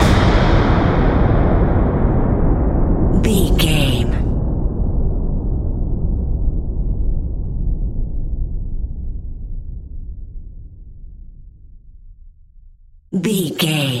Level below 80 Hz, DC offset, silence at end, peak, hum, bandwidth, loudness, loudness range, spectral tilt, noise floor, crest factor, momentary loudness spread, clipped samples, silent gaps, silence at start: -20 dBFS; under 0.1%; 0 s; 0 dBFS; none; 15 kHz; -18 LUFS; 19 LU; -6 dB/octave; -44 dBFS; 16 dB; 17 LU; under 0.1%; none; 0 s